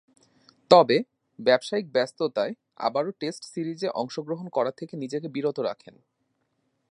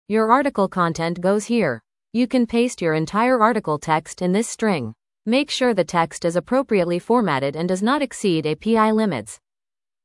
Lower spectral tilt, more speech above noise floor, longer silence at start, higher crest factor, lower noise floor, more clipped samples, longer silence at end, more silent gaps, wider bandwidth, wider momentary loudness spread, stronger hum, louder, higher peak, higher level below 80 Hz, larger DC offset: about the same, -5 dB/octave vs -5.5 dB/octave; second, 49 dB vs over 70 dB; first, 0.7 s vs 0.1 s; first, 26 dB vs 20 dB; second, -75 dBFS vs under -90 dBFS; neither; first, 1.15 s vs 0.7 s; neither; about the same, 11 kHz vs 12 kHz; first, 15 LU vs 6 LU; neither; second, -26 LUFS vs -20 LUFS; about the same, -2 dBFS vs -2 dBFS; second, -78 dBFS vs -58 dBFS; neither